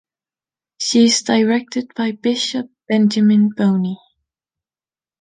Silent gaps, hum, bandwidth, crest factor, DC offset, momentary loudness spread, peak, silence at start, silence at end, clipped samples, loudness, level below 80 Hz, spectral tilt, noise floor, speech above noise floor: none; none; 9.6 kHz; 16 dB; under 0.1%; 11 LU; -2 dBFS; 0.8 s; 1.25 s; under 0.1%; -17 LUFS; -66 dBFS; -4.5 dB/octave; under -90 dBFS; over 74 dB